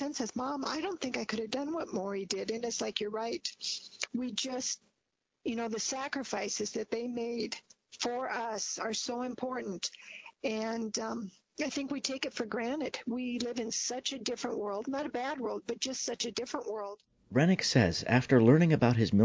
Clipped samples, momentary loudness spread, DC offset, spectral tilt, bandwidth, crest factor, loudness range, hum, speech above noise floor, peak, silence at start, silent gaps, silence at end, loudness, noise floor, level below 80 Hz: under 0.1%; 11 LU; under 0.1%; -4.5 dB/octave; 8 kHz; 22 dB; 6 LU; none; 51 dB; -12 dBFS; 0 s; none; 0 s; -33 LUFS; -84 dBFS; -62 dBFS